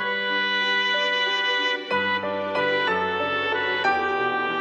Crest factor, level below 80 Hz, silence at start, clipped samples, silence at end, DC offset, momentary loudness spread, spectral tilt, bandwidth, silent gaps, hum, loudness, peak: 12 dB; -68 dBFS; 0 s; under 0.1%; 0 s; under 0.1%; 3 LU; -3.5 dB/octave; 14.5 kHz; none; none; -22 LUFS; -10 dBFS